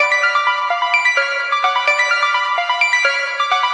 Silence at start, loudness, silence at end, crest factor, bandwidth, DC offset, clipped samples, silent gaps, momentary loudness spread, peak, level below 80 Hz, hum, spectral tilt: 0 s; -15 LUFS; 0 s; 16 dB; 10.5 kHz; under 0.1%; under 0.1%; none; 4 LU; -2 dBFS; under -90 dBFS; none; 4.5 dB/octave